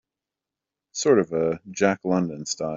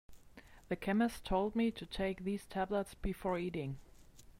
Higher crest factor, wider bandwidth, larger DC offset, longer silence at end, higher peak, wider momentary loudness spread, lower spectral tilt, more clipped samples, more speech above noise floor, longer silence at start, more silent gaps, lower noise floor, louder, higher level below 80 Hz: about the same, 20 dB vs 16 dB; second, 7.8 kHz vs 16 kHz; neither; second, 0 s vs 0.2 s; first, -6 dBFS vs -22 dBFS; about the same, 8 LU vs 9 LU; second, -5 dB/octave vs -6.5 dB/octave; neither; first, 65 dB vs 22 dB; first, 0.95 s vs 0.1 s; neither; first, -88 dBFS vs -59 dBFS; first, -23 LUFS vs -38 LUFS; second, -64 dBFS vs -54 dBFS